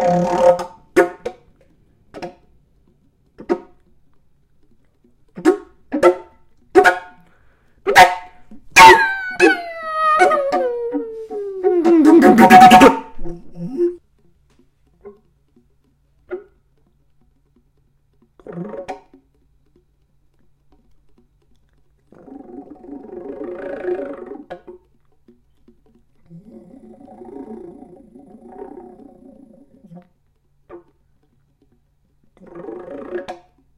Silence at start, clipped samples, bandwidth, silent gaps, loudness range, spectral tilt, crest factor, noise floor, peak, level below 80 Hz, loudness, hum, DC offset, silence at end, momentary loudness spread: 0 s; 0.2%; 16 kHz; none; 26 LU; -4 dB/octave; 18 dB; -60 dBFS; 0 dBFS; -46 dBFS; -13 LUFS; none; under 0.1%; 0.45 s; 29 LU